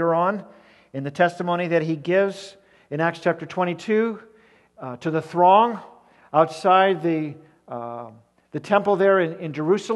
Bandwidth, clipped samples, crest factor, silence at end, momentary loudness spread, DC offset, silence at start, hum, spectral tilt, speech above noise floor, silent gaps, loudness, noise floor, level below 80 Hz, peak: 11.5 kHz; under 0.1%; 18 dB; 0 s; 19 LU; under 0.1%; 0 s; none; -6.5 dB/octave; 33 dB; none; -21 LUFS; -55 dBFS; -72 dBFS; -4 dBFS